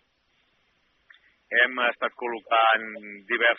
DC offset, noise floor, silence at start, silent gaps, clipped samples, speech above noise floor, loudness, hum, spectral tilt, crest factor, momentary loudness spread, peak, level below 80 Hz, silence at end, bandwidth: under 0.1%; -69 dBFS; 1.5 s; none; under 0.1%; 45 dB; -23 LUFS; none; 2 dB/octave; 20 dB; 13 LU; -8 dBFS; -82 dBFS; 0 s; 4 kHz